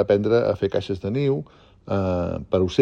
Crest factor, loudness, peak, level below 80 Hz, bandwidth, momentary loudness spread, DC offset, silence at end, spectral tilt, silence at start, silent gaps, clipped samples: 18 dB; -23 LUFS; -4 dBFS; -48 dBFS; 8.6 kHz; 9 LU; under 0.1%; 0 s; -8 dB/octave; 0 s; none; under 0.1%